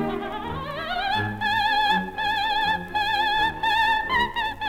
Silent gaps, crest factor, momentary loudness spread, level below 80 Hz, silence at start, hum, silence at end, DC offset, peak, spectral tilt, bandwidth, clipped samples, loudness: none; 14 dB; 9 LU; -46 dBFS; 0 s; none; 0 s; under 0.1%; -10 dBFS; -4 dB/octave; 16.5 kHz; under 0.1%; -23 LUFS